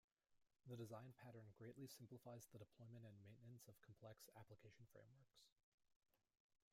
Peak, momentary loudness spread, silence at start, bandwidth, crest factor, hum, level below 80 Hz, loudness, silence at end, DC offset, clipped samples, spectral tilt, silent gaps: -44 dBFS; 9 LU; 0.3 s; 16 kHz; 20 dB; none; under -90 dBFS; -63 LUFS; 0.2 s; under 0.1%; under 0.1%; -5.5 dB/octave; 5.52-5.56 s, 5.63-5.78 s, 5.96-6.00 s, 6.40-6.50 s